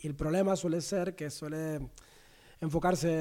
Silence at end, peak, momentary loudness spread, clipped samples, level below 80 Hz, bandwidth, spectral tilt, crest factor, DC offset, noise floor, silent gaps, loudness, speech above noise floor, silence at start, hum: 0 s; -16 dBFS; 11 LU; under 0.1%; -52 dBFS; 16.5 kHz; -6 dB/octave; 16 dB; under 0.1%; -58 dBFS; none; -33 LUFS; 26 dB; 0 s; none